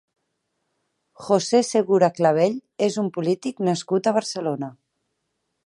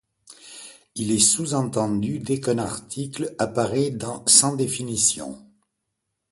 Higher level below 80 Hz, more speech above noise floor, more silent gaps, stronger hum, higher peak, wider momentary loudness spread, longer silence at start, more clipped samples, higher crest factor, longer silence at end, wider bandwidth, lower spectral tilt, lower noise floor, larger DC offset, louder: second, -74 dBFS vs -56 dBFS; about the same, 55 dB vs 56 dB; neither; neither; about the same, -4 dBFS vs -2 dBFS; second, 9 LU vs 21 LU; first, 1.2 s vs 0.3 s; neither; second, 18 dB vs 24 dB; about the same, 0.95 s vs 0.9 s; about the same, 11.5 kHz vs 12 kHz; first, -5.5 dB/octave vs -3.5 dB/octave; about the same, -76 dBFS vs -79 dBFS; neither; about the same, -22 LUFS vs -21 LUFS